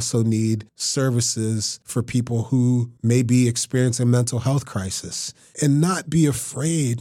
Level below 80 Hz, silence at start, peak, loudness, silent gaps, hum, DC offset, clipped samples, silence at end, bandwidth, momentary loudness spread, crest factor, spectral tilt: -56 dBFS; 0 s; -6 dBFS; -21 LUFS; none; none; under 0.1%; under 0.1%; 0 s; 14.5 kHz; 8 LU; 14 dB; -5.5 dB/octave